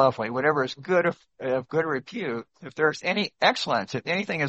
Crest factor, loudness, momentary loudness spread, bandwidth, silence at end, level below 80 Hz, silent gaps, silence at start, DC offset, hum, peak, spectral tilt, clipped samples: 22 dB; -26 LUFS; 9 LU; 8.4 kHz; 0 s; -70 dBFS; none; 0 s; under 0.1%; none; -4 dBFS; -5 dB/octave; under 0.1%